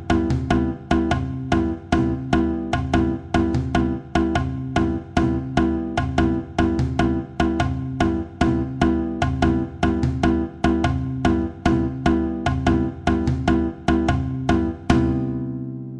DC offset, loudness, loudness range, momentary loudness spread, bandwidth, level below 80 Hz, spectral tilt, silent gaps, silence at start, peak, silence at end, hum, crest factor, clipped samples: under 0.1%; -22 LUFS; 1 LU; 3 LU; 9.8 kHz; -30 dBFS; -7.5 dB/octave; none; 0 s; -4 dBFS; 0 s; none; 18 dB; under 0.1%